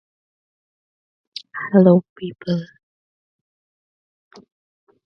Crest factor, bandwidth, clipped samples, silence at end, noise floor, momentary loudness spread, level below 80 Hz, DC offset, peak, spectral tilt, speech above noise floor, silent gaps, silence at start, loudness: 22 dB; 6 kHz; under 0.1%; 2.4 s; under -90 dBFS; 21 LU; -66 dBFS; under 0.1%; 0 dBFS; -9 dB/octave; over 73 dB; 2.09-2.16 s; 1.55 s; -18 LUFS